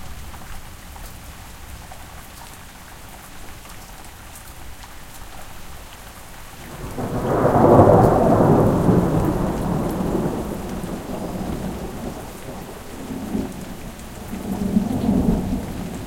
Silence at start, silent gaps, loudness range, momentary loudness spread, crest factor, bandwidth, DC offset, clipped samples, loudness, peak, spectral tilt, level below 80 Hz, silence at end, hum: 0 s; none; 22 LU; 23 LU; 22 dB; 17 kHz; under 0.1%; under 0.1%; -20 LUFS; 0 dBFS; -7.5 dB/octave; -36 dBFS; 0 s; none